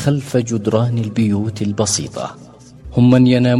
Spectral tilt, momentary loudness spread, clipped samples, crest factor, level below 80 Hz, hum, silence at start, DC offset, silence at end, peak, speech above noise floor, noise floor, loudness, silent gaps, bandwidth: -6 dB/octave; 12 LU; under 0.1%; 16 dB; -44 dBFS; none; 0 s; under 0.1%; 0 s; 0 dBFS; 22 dB; -37 dBFS; -16 LUFS; none; 12.5 kHz